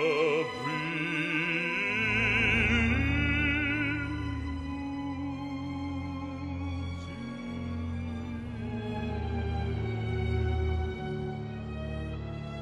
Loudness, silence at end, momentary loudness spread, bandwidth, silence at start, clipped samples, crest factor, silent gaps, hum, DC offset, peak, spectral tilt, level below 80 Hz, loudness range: -31 LUFS; 0 s; 12 LU; 10.5 kHz; 0 s; under 0.1%; 18 dB; none; none; under 0.1%; -14 dBFS; -6.5 dB/octave; -40 dBFS; 10 LU